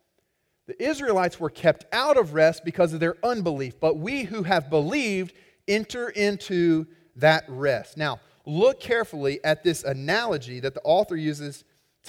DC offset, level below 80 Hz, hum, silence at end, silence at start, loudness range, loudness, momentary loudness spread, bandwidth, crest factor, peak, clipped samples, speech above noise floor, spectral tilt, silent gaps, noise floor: under 0.1%; -60 dBFS; none; 0 s; 0.7 s; 2 LU; -24 LUFS; 9 LU; 16.5 kHz; 18 dB; -6 dBFS; under 0.1%; 49 dB; -5.5 dB/octave; none; -73 dBFS